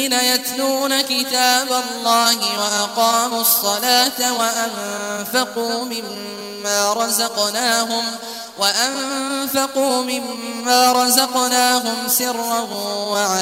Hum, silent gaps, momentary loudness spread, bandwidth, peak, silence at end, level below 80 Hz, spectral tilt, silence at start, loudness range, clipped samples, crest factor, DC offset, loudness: none; none; 10 LU; 16.5 kHz; 0 dBFS; 0 s; -68 dBFS; -0.5 dB/octave; 0 s; 4 LU; under 0.1%; 18 dB; under 0.1%; -17 LUFS